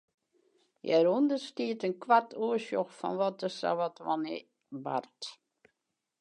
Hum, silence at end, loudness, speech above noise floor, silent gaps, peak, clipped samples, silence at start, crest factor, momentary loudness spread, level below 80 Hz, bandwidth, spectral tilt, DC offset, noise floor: none; 0.85 s; -31 LUFS; 54 dB; none; -12 dBFS; under 0.1%; 0.85 s; 20 dB; 16 LU; -90 dBFS; 10.5 kHz; -5.5 dB/octave; under 0.1%; -85 dBFS